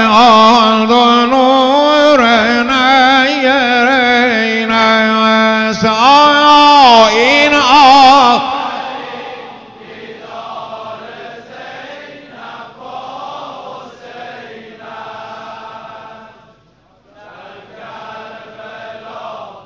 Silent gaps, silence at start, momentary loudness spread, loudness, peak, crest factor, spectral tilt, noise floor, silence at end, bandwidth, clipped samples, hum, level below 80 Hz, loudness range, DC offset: none; 0 s; 25 LU; -8 LUFS; 0 dBFS; 12 dB; -3.5 dB/octave; -50 dBFS; 0.15 s; 8 kHz; under 0.1%; none; -48 dBFS; 22 LU; under 0.1%